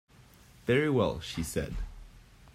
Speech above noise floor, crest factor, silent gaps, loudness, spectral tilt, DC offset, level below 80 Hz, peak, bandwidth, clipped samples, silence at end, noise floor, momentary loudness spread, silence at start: 28 dB; 18 dB; none; -31 LUFS; -5.5 dB/octave; under 0.1%; -46 dBFS; -14 dBFS; 16 kHz; under 0.1%; 0.05 s; -57 dBFS; 15 LU; 0.65 s